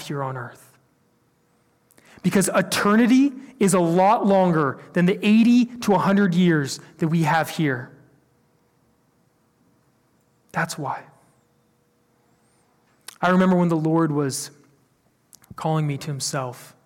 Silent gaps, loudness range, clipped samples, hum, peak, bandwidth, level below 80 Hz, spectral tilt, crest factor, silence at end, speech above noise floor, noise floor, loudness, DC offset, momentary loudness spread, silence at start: none; 16 LU; under 0.1%; none; -8 dBFS; 17 kHz; -62 dBFS; -6 dB/octave; 14 dB; 0.2 s; 44 dB; -64 dBFS; -21 LUFS; under 0.1%; 13 LU; 0 s